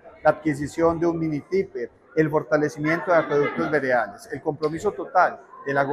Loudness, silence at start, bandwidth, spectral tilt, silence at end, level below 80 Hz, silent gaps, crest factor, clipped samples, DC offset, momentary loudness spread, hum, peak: -23 LUFS; 0.05 s; 13.5 kHz; -7 dB/octave; 0 s; -58 dBFS; none; 18 dB; under 0.1%; under 0.1%; 8 LU; none; -6 dBFS